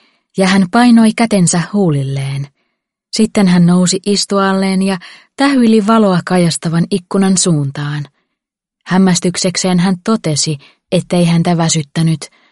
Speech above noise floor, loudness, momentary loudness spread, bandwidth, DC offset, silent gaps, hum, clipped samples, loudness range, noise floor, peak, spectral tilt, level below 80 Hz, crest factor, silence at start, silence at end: 65 dB; -12 LUFS; 11 LU; 11.5 kHz; under 0.1%; none; none; under 0.1%; 3 LU; -77 dBFS; 0 dBFS; -5 dB/octave; -52 dBFS; 12 dB; 0.35 s; 0.25 s